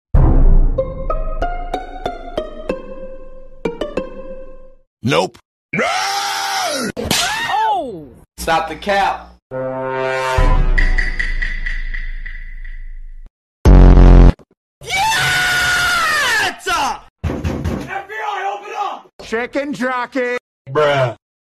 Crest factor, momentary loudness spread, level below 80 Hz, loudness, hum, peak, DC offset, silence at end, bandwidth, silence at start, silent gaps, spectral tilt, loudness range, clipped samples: 16 dB; 16 LU; -18 dBFS; -17 LUFS; none; 0 dBFS; under 0.1%; 0.3 s; 13.5 kHz; 0.15 s; 4.87-4.97 s, 5.45-5.69 s, 9.42-9.50 s, 13.30-13.64 s, 14.57-14.81 s, 17.10-17.16 s, 19.13-19.19 s, 20.40-20.65 s; -4.5 dB/octave; 11 LU; under 0.1%